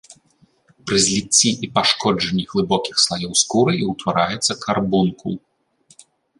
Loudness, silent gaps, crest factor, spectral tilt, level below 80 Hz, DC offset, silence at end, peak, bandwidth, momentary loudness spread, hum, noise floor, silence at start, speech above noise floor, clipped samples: -18 LUFS; none; 18 dB; -3 dB/octave; -52 dBFS; under 0.1%; 1 s; -2 dBFS; 11.5 kHz; 7 LU; none; -59 dBFS; 0.1 s; 40 dB; under 0.1%